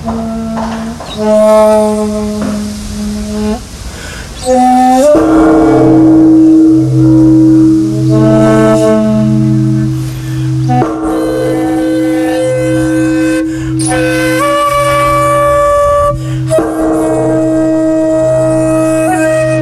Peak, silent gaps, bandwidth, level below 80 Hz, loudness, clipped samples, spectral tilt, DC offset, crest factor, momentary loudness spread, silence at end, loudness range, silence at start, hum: 0 dBFS; none; 13.5 kHz; -30 dBFS; -9 LUFS; under 0.1%; -6.5 dB/octave; under 0.1%; 8 dB; 11 LU; 0 s; 6 LU; 0 s; none